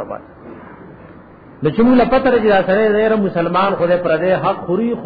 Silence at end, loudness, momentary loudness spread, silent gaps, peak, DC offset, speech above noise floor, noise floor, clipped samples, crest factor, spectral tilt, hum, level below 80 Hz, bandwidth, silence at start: 0 s; -15 LUFS; 8 LU; none; -2 dBFS; under 0.1%; 26 dB; -40 dBFS; under 0.1%; 12 dB; -9.5 dB/octave; none; -42 dBFS; 5 kHz; 0 s